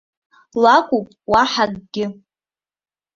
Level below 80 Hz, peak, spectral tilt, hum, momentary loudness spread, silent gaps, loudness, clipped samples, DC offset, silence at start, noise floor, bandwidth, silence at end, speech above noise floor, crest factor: -52 dBFS; -2 dBFS; -4.5 dB/octave; 50 Hz at -50 dBFS; 13 LU; none; -17 LUFS; under 0.1%; under 0.1%; 0.55 s; under -90 dBFS; 7.6 kHz; 1.05 s; over 73 dB; 18 dB